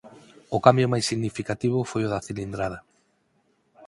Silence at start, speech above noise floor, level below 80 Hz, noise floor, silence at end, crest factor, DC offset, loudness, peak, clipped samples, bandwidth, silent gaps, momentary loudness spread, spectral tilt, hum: 0.05 s; 44 dB; -54 dBFS; -68 dBFS; 0 s; 26 dB; under 0.1%; -25 LUFS; 0 dBFS; under 0.1%; 11.5 kHz; none; 13 LU; -5.5 dB/octave; none